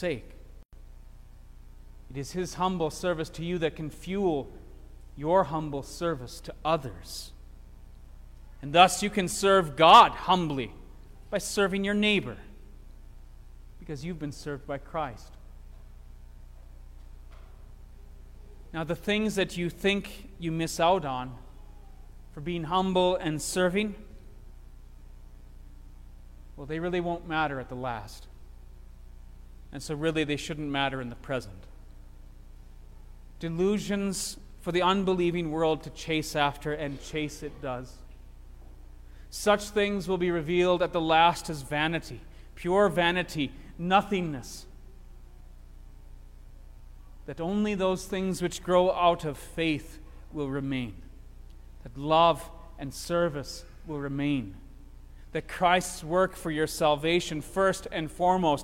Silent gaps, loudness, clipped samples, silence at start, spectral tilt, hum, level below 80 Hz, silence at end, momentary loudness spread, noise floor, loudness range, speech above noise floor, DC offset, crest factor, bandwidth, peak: 0.65-0.69 s; -28 LUFS; under 0.1%; 0 s; -4.5 dB/octave; 60 Hz at -55 dBFS; -46 dBFS; 0 s; 17 LU; -48 dBFS; 12 LU; 20 dB; under 0.1%; 26 dB; 16.5 kHz; -2 dBFS